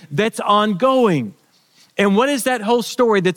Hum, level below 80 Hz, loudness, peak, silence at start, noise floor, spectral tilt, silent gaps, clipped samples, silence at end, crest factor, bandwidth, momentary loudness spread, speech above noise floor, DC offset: none; -66 dBFS; -17 LUFS; -2 dBFS; 0.1 s; -54 dBFS; -5 dB/octave; none; under 0.1%; 0 s; 14 dB; 18 kHz; 6 LU; 38 dB; under 0.1%